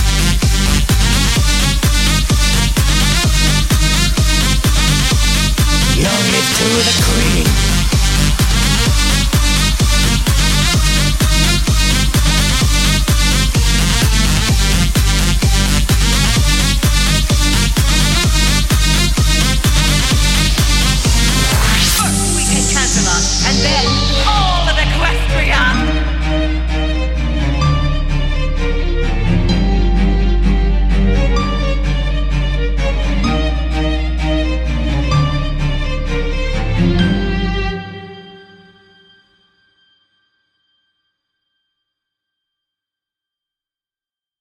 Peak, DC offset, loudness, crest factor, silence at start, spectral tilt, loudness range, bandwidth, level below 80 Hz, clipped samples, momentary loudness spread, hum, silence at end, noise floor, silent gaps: 0 dBFS; under 0.1%; -14 LUFS; 14 dB; 0 s; -3.5 dB/octave; 5 LU; 16.5 kHz; -16 dBFS; under 0.1%; 6 LU; none; 6.05 s; under -90 dBFS; none